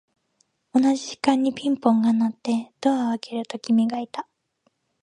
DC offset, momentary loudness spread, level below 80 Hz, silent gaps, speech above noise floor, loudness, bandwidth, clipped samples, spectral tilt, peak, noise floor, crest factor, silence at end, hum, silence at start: under 0.1%; 11 LU; -74 dBFS; none; 48 dB; -23 LUFS; 10.5 kHz; under 0.1%; -5.5 dB/octave; -4 dBFS; -70 dBFS; 20 dB; 0.8 s; none; 0.75 s